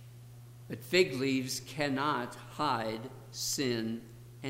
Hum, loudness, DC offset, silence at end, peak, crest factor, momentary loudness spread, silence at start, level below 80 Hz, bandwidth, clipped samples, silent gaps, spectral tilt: none; -33 LUFS; under 0.1%; 0 s; -14 dBFS; 22 dB; 23 LU; 0 s; -66 dBFS; 16 kHz; under 0.1%; none; -4 dB/octave